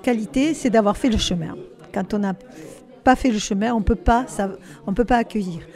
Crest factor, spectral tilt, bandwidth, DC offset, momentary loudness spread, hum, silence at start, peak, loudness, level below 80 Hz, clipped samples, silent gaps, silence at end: 20 dB; -5 dB/octave; 13.5 kHz; under 0.1%; 15 LU; none; 0.05 s; -2 dBFS; -21 LUFS; -34 dBFS; under 0.1%; none; 0.05 s